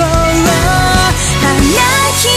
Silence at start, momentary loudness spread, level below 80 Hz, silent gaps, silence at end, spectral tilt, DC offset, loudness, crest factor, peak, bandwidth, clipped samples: 0 s; 2 LU; -20 dBFS; none; 0 s; -3.5 dB/octave; under 0.1%; -10 LUFS; 10 dB; 0 dBFS; 16 kHz; under 0.1%